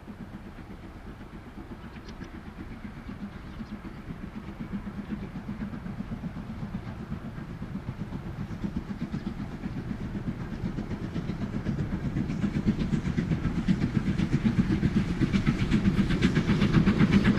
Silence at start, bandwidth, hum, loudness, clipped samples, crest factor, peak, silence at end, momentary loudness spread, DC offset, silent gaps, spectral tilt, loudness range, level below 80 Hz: 0 s; 11 kHz; none; -30 LUFS; under 0.1%; 20 dB; -10 dBFS; 0 s; 18 LU; under 0.1%; none; -7.5 dB/octave; 15 LU; -40 dBFS